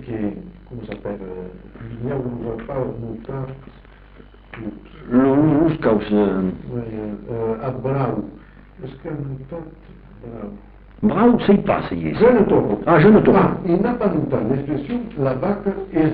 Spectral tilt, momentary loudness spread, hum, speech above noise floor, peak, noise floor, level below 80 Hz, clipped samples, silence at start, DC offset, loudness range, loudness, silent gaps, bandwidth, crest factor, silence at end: -7.5 dB/octave; 21 LU; none; 25 dB; -2 dBFS; -44 dBFS; -42 dBFS; under 0.1%; 0 s; under 0.1%; 13 LU; -19 LUFS; none; 4.8 kHz; 18 dB; 0 s